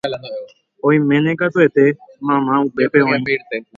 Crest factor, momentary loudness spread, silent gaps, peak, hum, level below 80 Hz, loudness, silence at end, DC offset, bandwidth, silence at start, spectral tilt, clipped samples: 16 dB; 11 LU; none; 0 dBFS; none; -62 dBFS; -16 LUFS; 0.15 s; under 0.1%; 7.2 kHz; 0.05 s; -8.5 dB/octave; under 0.1%